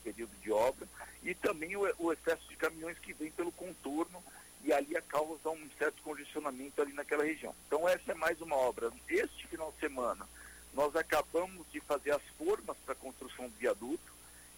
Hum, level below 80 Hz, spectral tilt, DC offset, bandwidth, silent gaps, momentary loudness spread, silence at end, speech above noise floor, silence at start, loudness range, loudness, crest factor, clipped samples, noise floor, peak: none; -64 dBFS; -3.5 dB/octave; under 0.1%; 16.5 kHz; none; 12 LU; 0 s; 20 dB; 0 s; 3 LU; -37 LUFS; 18 dB; under 0.1%; -56 dBFS; -20 dBFS